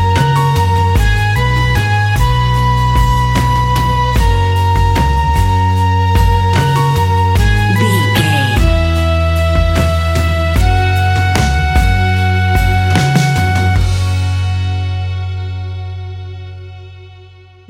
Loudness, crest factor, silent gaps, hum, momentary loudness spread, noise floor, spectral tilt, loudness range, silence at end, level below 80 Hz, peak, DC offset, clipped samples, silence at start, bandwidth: -13 LUFS; 12 dB; none; none; 8 LU; -38 dBFS; -5.5 dB/octave; 4 LU; 0.45 s; -18 dBFS; 0 dBFS; under 0.1%; under 0.1%; 0 s; 16 kHz